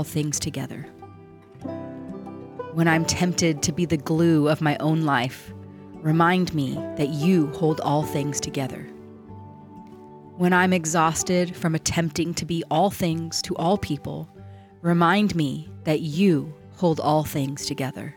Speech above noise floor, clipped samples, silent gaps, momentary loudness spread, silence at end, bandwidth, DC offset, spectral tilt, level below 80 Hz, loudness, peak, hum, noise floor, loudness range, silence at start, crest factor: 23 dB; under 0.1%; none; 20 LU; 0.05 s; 18.5 kHz; under 0.1%; -5 dB/octave; -54 dBFS; -23 LUFS; -8 dBFS; none; -46 dBFS; 3 LU; 0 s; 16 dB